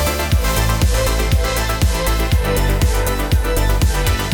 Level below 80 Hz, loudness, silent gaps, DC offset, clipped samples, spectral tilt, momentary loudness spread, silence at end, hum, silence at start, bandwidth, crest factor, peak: -18 dBFS; -17 LUFS; none; under 0.1%; under 0.1%; -4.5 dB/octave; 2 LU; 0 s; none; 0 s; 20 kHz; 10 dB; -6 dBFS